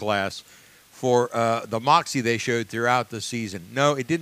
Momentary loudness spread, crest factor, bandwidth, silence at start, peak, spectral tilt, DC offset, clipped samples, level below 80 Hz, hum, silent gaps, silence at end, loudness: 10 LU; 20 dB; 15.5 kHz; 0 s; -4 dBFS; -4.5 dB/octave; under 0.1%; under 0.1%; -66 dBFS; none; none; 0 s; -23 LUFS